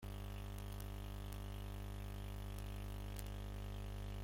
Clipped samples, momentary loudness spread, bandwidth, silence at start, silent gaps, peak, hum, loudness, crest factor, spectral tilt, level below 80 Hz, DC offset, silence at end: under 0.1%; 1 LU; 16.5 kHz; 0 s; none; -24 dBFS; 50 Hz at -45 dBFS; -49 LUFS; 22 dB; -5.5 dB/octave; -50 dBFS; under 0.1%; 0 s